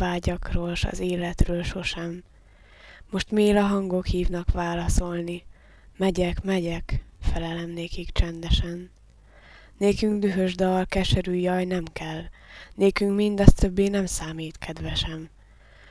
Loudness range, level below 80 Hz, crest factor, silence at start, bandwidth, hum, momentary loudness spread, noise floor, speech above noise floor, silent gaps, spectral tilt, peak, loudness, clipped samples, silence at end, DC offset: 5 LU; -32 dBFS; 24 dB; 0 s; 11 kHz; none; 13 LU; -52 dBFS; 29 dB; none; -6 dB/octave; 0 dBFS; -26 LUFS; under 0.1%; 0.65 s; under 0.1%